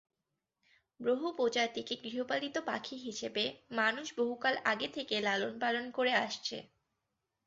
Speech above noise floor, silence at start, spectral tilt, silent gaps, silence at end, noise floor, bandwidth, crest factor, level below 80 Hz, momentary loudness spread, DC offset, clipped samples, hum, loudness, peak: 53 dB; 1 s; -0.5 dB/octave; none; 0.8 s; -88 dBFS; 7.8 kHz; 20 dB; -78 dBFS; 8 LU; under 0.1%; under 0.1%; none; -34 LUFS; -16 dBFS